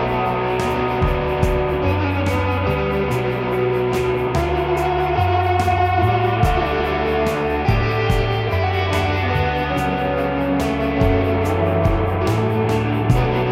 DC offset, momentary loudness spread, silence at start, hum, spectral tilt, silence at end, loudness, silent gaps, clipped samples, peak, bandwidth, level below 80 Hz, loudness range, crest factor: under 0.1%; 3 LU; 0 s; none; -7 dB/octave; 0 s; -19 LUFS; none; under 0.1%; -2 dBFS; 15.5 kHz; -30 dBFS; 1 LU; 16 dB